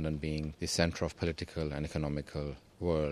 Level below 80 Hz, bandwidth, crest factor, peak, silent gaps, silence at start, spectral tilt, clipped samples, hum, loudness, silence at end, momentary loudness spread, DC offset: -46 dBFS; 14 kHz; 24 dB; -10 dBFS; none; 0 s; -5.5 dB/octave; under 0.1%; none; -35 LUFS; 0 s; 8 LU; under 0.1%